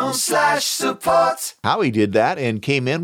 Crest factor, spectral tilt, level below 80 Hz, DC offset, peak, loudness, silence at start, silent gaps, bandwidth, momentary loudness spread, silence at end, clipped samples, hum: 14 dB; -3.5 dB/octave; -60 dBFS; under 0.1%; -4 dBFS; -19 LUFS; 0 s; none; 18 kHz; 4 LU; 0 s; under 0.1%; none